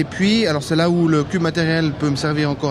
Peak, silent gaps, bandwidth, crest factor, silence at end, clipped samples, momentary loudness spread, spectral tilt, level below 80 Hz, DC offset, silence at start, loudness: -2 dBFS; none; 12.5 kHz; 14 dB; 0 s; under 0.1%; 4 LU; -6 dB/octave; -46 dBFS; under 0.1%; 0 s; -18 LUFS